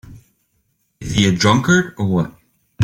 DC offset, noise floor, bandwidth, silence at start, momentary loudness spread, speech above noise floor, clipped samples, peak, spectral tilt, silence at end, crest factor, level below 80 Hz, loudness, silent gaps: under 0.1%; -66 dBFS; 15.5 kHz; 0.05 s; 11 LU; 51 dB; under 0.1%; -2 dBFS; -5 dB/octave; 0 s; 16 dB; -44 dBFS; -16 LUFS; none